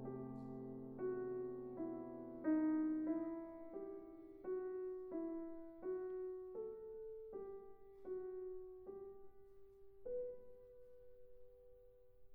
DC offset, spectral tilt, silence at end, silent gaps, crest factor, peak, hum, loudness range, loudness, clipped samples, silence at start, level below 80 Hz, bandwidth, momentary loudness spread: under 0.1%; -5.5 dB/octave; 0 s; none; 18 dB; -30 dBFS; none; 10 LU; -47 LUFS; under 0.1%; 0 s; -72 dBFS; 2.5 kHz; 24 LU